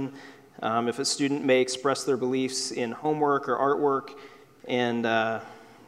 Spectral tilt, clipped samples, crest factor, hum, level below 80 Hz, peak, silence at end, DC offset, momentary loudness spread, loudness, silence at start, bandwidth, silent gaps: -4 dB/octave; under 0.1%; 18 dB; none; -76 dBFS; -10 dBFS; 0.25 s; under 0.1%; 13 LU; -26 LUFS; 0 s; 14.5 kHz; none